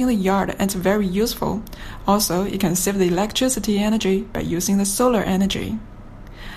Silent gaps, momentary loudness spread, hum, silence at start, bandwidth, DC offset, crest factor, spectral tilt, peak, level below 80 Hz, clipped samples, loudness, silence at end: none; 8 LU; none; 0 s; 15.5 kHz; under 0.1%; 16 dB; -4.5 dB/octave; -4 dBFS; -38 dBFS; under 0.1%; -20 LUFS; 0 s